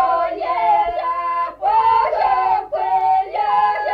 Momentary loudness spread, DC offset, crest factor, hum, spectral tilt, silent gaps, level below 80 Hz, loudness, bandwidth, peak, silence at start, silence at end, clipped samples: 5 LU; under 0.1%; 10 dB; none; -5 dB/octave; none; -50 dBFS; -18 LUFS; 5.6 kHz; -6 dBFS; 0 s; 0 s; under 0.1%